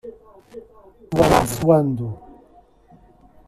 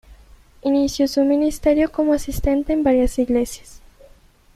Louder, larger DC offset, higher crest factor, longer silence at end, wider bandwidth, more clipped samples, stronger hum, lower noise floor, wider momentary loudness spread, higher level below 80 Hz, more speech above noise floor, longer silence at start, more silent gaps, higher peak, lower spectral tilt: about the same, -19 LUFS vs -19 LUFS; neither; about the same, 20 dB vs 16 dB; first, 1.3 s vs 0.8 s; about the same, 14.5 kHz vs 14.5 kHz; neither; neither; about the same, -52 dBFS vs -50 dBFS; first, 26 LU vs 4 LU; second, -42 dBFS vs -34 dBFS; about the same, 34 dB vs 32 dB; about the same, 0.05 s vs 0.1 s; neither; about the same, -2 dBFS vs -4 dBFS; about the same, -6 dB/octave vs -5.5 dB/octave